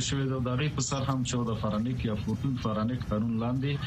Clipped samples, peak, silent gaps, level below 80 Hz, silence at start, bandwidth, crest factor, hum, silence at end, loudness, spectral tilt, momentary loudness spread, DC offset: under 0.1%; -14 dBFS; none; -46 dBFS; 0 s; 8.8 kHz; 14 dB; none; 0 s; -30 LUFS; -5.5 dB/octave; 2 LU; under 0.1%